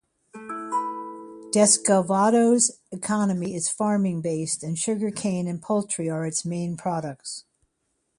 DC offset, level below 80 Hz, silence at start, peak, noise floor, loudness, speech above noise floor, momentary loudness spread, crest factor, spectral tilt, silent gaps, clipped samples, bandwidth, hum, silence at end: under 0.1%; -66 dBFS; 0.35 s; -4 dBFS; -75 dBFS; -24 LUFS; 51 dB; 17 LU; 20 dB; -4.5 dB/octave; none; under 0.1%; 11.5 kHz; none; 0.8 s